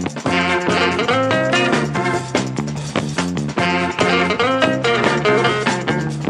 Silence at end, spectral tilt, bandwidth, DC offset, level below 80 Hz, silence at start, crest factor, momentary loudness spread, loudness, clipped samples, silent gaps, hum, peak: 0 s; -5 dB/octave; 12 kHz; under 0.1%; -48 dBFS; 0 s; 16 dB; 6 LU; -17 LUFS; under 0.1%; none; none; 0 dBFS